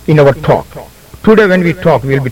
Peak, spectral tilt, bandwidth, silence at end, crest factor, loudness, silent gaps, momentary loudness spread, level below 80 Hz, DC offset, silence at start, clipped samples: 0 dBFS; -8 dB/octave; 16.5 kHz; 0 s; 10 dB; -10 LUFS; none; 7 LU; -36 dBFS; under 0.1%; 0.05 s; 0.6%